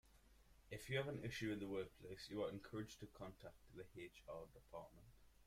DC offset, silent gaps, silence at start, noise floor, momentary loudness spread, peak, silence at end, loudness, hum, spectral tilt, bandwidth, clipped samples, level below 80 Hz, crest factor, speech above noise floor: under 0.1%; none; 0.05 s; -70 dBFS; 14 LU; -30 dBFS; 0 s; -51 LUFS; none; -5.5 dB/octave; 16 kHz; under 0.1%; -70 dBFS; 22 dB; 20 dB